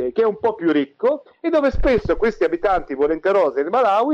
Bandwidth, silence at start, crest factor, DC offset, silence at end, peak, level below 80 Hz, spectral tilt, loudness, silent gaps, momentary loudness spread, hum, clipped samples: 7.4 kHz; 0 s; 8 dB; under 0.1%; 0 s; -10 dBFS; -34 dBFS; -7 dB/octave; -19 LUFS; none; 4 LU; none; under 0.1%